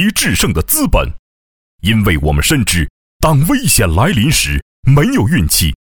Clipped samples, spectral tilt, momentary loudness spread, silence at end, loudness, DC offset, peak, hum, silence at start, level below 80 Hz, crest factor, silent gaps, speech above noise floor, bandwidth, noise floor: under 0.1%; -4 dB/octave; 6 LU; 0.1 s; -12 LUFS; under 0.1%; 0 dBFS; none; 0 s; -22 dBFS; 12 dB; 1.19-1.79 s, 2.90-3.20 s, 4.62-4.83 s; over 78 dB; over 20 kHz; under -90 dBFS